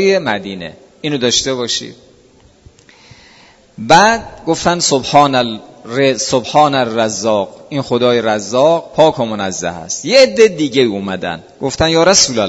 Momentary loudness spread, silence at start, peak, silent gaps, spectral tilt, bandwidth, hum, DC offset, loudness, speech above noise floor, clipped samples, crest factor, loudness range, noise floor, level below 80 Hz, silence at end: 13 LU; 0 s; 0 dBFS; none; -3.5 dB/octave; 11 kHz; none; under 0.1%; -13 LUFS; 34 dB; 0.2%; 14 dB; 5 LU; -47 dBFS; -44 dBFS; 0 s